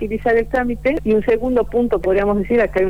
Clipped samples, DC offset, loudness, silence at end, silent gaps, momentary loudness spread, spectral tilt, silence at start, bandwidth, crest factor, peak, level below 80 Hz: under 0.1%; 2%; -18 LUFS; 0 s; none; 2 LU; -8 dB/octave; 0 s; 19.5 kHz; 10 dB; -8 dBFS; -34 dBFS